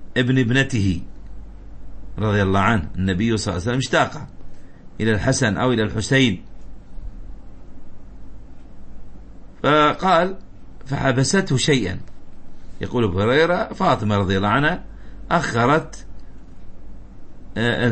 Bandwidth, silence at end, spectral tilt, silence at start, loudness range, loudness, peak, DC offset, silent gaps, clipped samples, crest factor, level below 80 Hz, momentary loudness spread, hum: 8.8 kHz; 0 s; -5.5 dB/octave; 0 s; 4 LU; -19 LUFS; -2 dBFS; under 0.1%; none; under 0.1%; 20 dB; -38 dBFS; 18 LU; none